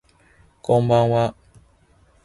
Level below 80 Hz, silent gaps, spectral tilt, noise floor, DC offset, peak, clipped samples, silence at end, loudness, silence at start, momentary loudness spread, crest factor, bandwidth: -54 dBFS; none; -8 dB/octave; -57 dBFS; under 0.1%; -6 dBFS; under 0.1%; 0.95 s; -19 LUFS; 0.7 s; 10 LU; 18 dB; 11.5 kHz